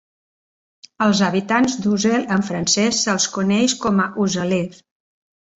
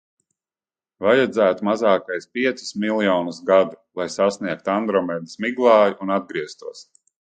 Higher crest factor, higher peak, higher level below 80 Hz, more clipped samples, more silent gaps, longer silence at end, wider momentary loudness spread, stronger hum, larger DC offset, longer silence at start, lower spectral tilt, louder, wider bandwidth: about the same, 16 dB vs 18 dB; about the same, -4 dBFS vs -2 dBFS; first, -56 dBFS vs -64 dBFS; neither; neither; first, 0.85 s vs 0.45 s; second, 5 LU vs 12 LU; neither; neither; about the same, 1 s vs 1 s; about the same, -4 dB/octave vs -5 dB/octave; about the same, -18 LUFS vs -20 LUFS; second, 8.2 kHz vs 9.2 kHz